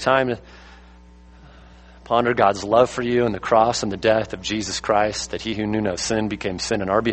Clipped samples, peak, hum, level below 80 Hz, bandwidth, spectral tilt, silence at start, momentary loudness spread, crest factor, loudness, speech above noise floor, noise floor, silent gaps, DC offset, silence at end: under 0.1%; -2 dBFS; none; -46 dBFS; 8.8 kHz; -4.5 dB/octave; 0 s; 8 LU; 20 dB; -21 LUFS; 26 dB; -46 dBFS; none; under 0.1%; 0 s